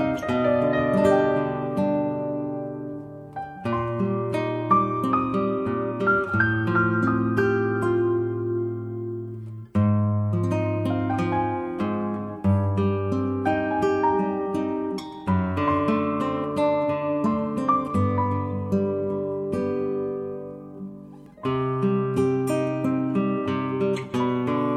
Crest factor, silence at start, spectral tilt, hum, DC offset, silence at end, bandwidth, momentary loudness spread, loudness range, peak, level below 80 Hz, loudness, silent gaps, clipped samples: 16 dB; 0 s; -8.5 dB/octave; none; under 0.1%; 0 s; 12.5 kHz; 10 LU; 4 LU; -8 dBFS; -54 dBFS; -24 LUFS; none; under 0.1%